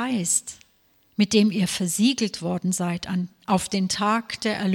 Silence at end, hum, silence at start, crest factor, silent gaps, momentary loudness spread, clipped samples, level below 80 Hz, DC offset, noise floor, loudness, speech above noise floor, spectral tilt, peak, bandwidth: 0 s; none; 0 s; 18 dB; none; 8 LU; under 0.1%; -60 dBFS; under 0.1%; -62 dBFS; -23 LUFS; 39 dB; -4 dB/octave; -6 dBFS; 16.5 kHz